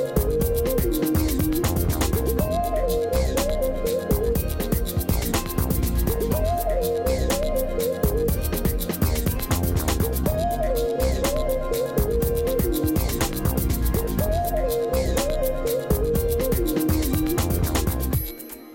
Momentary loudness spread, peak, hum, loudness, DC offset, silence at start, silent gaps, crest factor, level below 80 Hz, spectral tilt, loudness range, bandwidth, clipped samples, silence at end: 2 LU; -10 dBFS; none; -24 LUFS; under 0.1%; 0 s; none; 12 dB; -28 dBFS; -5.5 dB/octave; 1 LU; 17.5 kHz; under 0.1%; 0 s